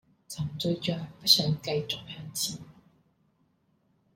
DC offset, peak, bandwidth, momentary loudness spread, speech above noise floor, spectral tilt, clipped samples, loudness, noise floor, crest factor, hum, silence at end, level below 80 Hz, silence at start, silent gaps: under 0.1%; -6 dBFS; 16.5 kHz; 15 LU; 41 dB; -3.5 dB/octave; under 0.1%; -28 LUFS; -70 dBFS; 26 dB; none; 1.45 s; -64 dBFS; 0.3 s; none